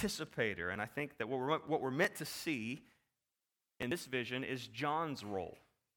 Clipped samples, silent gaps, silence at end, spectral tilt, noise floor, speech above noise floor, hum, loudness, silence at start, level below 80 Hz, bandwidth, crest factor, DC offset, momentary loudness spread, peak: under 0.1%; none; 0.4 s; -4.5 dB/octave; under -90 dBFS; over 51 dB; none; -39 LUFS; 0 s; -70 dBFS; 19 kHz; 22 dB; under 0.1%; 8 LU; -18 dBFS